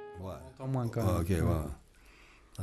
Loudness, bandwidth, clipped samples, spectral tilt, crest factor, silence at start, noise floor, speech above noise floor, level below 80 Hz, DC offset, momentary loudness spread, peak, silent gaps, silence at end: -34 LUFS; 14.5 kHz; under 0.1%; -7.5 dB/octave; 16 dB; 0 s; -58 dBFS; 27 dB; -46 dBFS; under 0.1%; 15 LU; -18 dBFS; none; 0 s